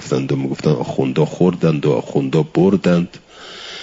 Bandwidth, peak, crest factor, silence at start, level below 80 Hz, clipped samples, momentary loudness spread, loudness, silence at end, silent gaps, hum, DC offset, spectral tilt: 7.8 kHz; -2 dBFS; 14 dB; 0 s; -54 dBFS; under 0.1%; 15 LU; -17 LUFS; 0 s; none; none; under 0.1%; -7.5 dB/octave